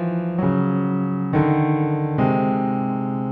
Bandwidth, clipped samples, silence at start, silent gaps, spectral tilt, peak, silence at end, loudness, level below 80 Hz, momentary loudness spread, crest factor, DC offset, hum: 4.5 kHz; under 0.1%; 0 s; none; -11.5 dB/octave; -6 dBFS; 0 s; -21 LUFS; -50 dBFS; 4 LU; 14 dB; under 0.1%; none